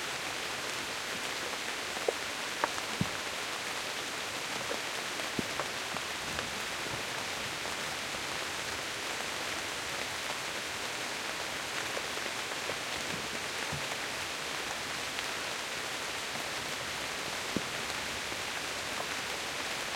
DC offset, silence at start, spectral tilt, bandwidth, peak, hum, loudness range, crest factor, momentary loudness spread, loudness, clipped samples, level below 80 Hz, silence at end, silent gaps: under 0.1%; 0 s; -1.5 dB/octave; 16.5 kHz; -10 dBFS; none; 1 LU; 26 dB; 1 LU; -35 LUFS; under 0.1%; -64 dBFS; 0 s; none